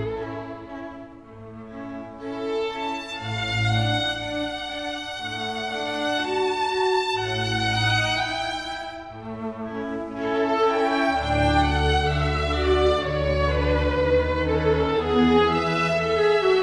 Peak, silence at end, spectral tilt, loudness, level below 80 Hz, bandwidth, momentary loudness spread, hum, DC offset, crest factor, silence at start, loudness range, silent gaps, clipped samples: -8 dBFS; 0 s; -5.5 dB/octave; -23 LUFS; -34 dBFS; 11 kHz; 15 LU; none; 0.1%; 16 dB; 0 s; 5 LU; none; under 0.1%